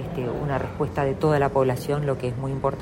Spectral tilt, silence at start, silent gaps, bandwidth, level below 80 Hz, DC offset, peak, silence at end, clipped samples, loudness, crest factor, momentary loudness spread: -7.5 dB/octave; 0 s; none; 16 kHz; -44 dBFS; under 0.1%; -8 dBFS; 0 s; under 0.1%; -25 LUFS; 16 dB; 7 LU